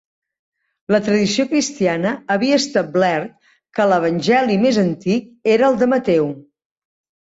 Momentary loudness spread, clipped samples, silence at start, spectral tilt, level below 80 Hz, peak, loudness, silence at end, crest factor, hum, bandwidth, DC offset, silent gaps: 6 LU; under 0.1%; 0.9 s; -5 dB/octave; -58 dBFS; -4 dBFS; -17 LUFS; 0.8 s; 14 dB; none; 8 kHz; under 0.1%; none